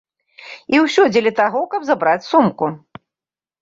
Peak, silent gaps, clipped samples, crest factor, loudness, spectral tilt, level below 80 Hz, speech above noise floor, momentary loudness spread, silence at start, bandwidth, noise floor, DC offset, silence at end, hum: -2 dBFS; none; under 0.1%; 16 dB; -16 LUFS; -5.5 dB/octave; -62 dBFS; over 74 dB; 15 LU; 0.4 s; 7.8 kHz; under -90 dBFS; under 0.1%; 0.85 s; none